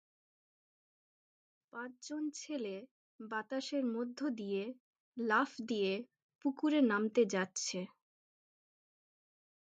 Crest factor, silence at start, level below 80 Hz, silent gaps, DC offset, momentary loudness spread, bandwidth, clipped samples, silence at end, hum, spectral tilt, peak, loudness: 20 dB; 1.75 s; -90 dBFS; 2.91-3.19 s, 4.80-4.93 s, 5.00-5.12 s, 6.22-6.29 s, 6.35-6.39 s; under 0.1%; 17 LU; 9 kHz; under 0.1%; 1.75 s; none; -4 dB/octave; -20 dBFS; -37 LUFS